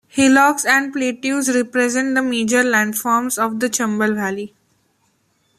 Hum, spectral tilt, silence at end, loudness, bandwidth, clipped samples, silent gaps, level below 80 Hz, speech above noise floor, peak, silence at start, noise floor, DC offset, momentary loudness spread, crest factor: none; -3 dB/octave; 1.1 s; -17 LUFS; 15 kHz; under 0.1%; none; -62 dBFS; 46 dB; -2 dBFS; 0.15 s; -63 dBFS; under 0.1%; 8 LU; 16 dB